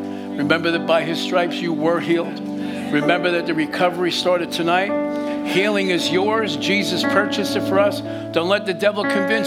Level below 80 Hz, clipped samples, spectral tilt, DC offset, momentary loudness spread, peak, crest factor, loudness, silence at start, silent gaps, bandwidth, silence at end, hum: -62 dBFS; under 0.1%; -4.5 dB/octave; under 0.1%; 5 LU; -2 dBFS; 18 dB; -19 LUFS; 0 s; none; 16 kHz; 0 s; none